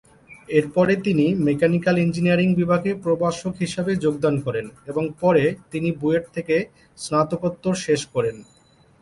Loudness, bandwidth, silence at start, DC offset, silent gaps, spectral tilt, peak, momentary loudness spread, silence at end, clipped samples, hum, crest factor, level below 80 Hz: -22 LUFS; 11.5 kHz; 0.3 s; under 0.1%; none; -6.5 dB/octave; -4 dBFS; 8 LU; 0.6 s; under 0.1%; none; 16 dB; -54 dBFS